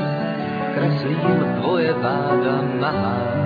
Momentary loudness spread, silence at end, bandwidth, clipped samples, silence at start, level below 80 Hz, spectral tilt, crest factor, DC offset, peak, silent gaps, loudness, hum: 4 LU; 0 s; 5 kHz; under 0.1%; 0 s; -56 dBFS; -9.5 dB/octave; 14 dB; under 0.1%; -6 dBFS; none; -21 LUFS; none